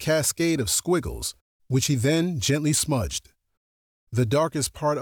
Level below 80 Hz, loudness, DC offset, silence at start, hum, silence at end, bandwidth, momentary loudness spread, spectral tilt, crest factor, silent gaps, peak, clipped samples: -46 dBFS; -24 LUFS; under 0.1%; 0 s; none; 0 s; over 20 kHz; 9 LU; -4.5 dB/octave; 12 dB; 1.41-1.60 s, 3.57-4.07 s; -12 dBFS; under 0.1%